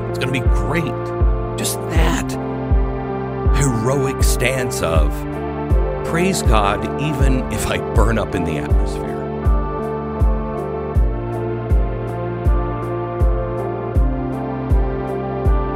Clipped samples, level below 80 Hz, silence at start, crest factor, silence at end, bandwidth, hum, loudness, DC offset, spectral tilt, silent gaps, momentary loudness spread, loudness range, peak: under 0.1%; -20 dBFS; 0 s; 18 dB; 0 s; 16 kHz; none; -20 LUFS; under 0.1%; -6 dB/octave; none; 6 LU; 3 LU; 0 dBFS